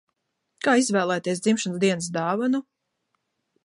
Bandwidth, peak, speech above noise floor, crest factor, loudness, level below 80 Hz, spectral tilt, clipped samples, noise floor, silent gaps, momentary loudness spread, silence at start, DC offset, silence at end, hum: 11.5 kHz; -8 dBFS; 54 dB; 16 dB; -24 LUFS; -74 dBFS; -4.5 dB/octave; under 0.1%; -77 dBFS; none; 6 LU; 0.65 s; under 0.1%; 1.05 s; none